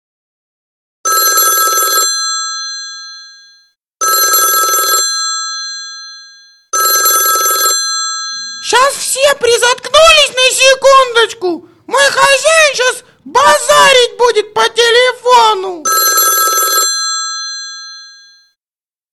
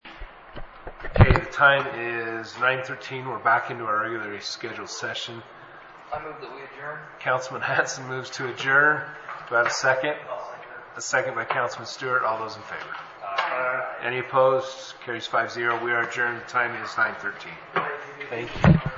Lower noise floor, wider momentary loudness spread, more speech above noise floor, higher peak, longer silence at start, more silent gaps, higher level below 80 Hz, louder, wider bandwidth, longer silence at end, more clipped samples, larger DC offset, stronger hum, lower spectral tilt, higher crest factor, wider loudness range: first, under -90 dBFS vs -45 dBFS; second, 14 LU vs 19 LU; first, over 78 dB vs 20 dB; about the same, 0 dBFS vs 0 dBFS; first, 1.05 s vs 0.05 s; neither; second, -48 dBFS vs -40 dBFS; first, -9 LUFS vs -25 LUFS; first, 13 kHz vs 8 kHz; first, 1.05 s vs 0 s; neither; neither; first, 60 Hz at -65 dBFS vs none; second, 1.5 dB/octave vs -5 dB/octave; second, 12 dB vs 24 dB; second, 4 LU vs 7 LU